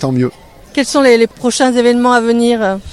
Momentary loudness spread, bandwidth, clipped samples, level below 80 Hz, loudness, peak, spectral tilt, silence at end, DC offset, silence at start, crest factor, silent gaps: 8 LU; 13.5 kHz; 0.1%; -44 dBFS; -12 LUFS; 0 dBFS; -4.5 dB/octave; 0 s; under 0.1%; 0 s; 12 dB; none